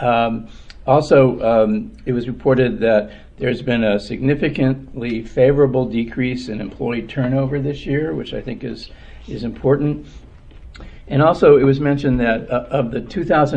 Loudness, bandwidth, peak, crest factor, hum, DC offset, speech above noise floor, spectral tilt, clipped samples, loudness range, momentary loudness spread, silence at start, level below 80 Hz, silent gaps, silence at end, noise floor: -18 LUFS; 8.8 kHz; 0 dBFS; 18 dB; none; under 0.1%; 22 dB; -8 dB/octave; under 0.1%; 6 LU; 15 LU; 0 s; -38 dBFS; none; 0 s; -39 dBFS